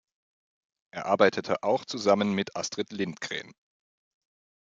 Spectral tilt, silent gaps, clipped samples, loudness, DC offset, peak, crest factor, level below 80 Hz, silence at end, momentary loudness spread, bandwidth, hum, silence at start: -4.5 dB/octave; none; under 0.1%; -28 LUFS; under 0.1%; -6 dBFS; 24 dB; -76 dBFS; 1.2 s; 12 LU; 7.8 kHz; none; 0.95 s